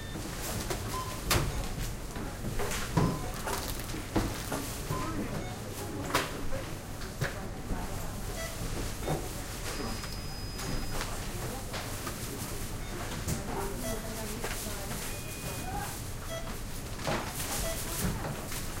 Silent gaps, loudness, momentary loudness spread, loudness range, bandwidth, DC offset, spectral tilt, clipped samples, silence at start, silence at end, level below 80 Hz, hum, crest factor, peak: none; -35 LUFS; 7 LU; 4 LU; 16.5 kHz; under 0.1%; -4 dB/octave; under 0.1%; 0 s; 0 s; -40 dBFS; none; 22 dB; -12 dBFS